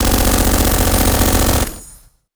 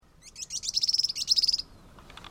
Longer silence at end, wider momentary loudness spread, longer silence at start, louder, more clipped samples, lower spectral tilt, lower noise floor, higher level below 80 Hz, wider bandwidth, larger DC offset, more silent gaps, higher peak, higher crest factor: first, 0.45 s vs 0 s; second, 7 LU vs 16 LU; second, 0 s vs 0.25 s; first, -14 LUFS vs -25 LUFS; neither; first, -4 dB/octave vs 1.5 dB/octave; second, -43 dBFS vs -51 dBFS; first, -18 dBFS vs -58 dBFS; first, over 20 kHz vs 16.5 kHz; neither; neither; first, 0 dBFS vs -12 dBFS; second, 14 dB vs 20 dB